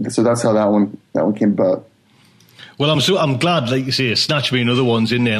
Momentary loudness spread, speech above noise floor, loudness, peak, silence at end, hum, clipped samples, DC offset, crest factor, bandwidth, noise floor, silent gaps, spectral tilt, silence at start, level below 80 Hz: 5 LU; 36 dB; -16 LUFS; -4 dBFS; 0 s; none; under 0.1%; under 0.1%; 14 dB; 13.5 kHz; -52 dBFS; none; -5.5 dB/octave; 0 s; -58 dBFS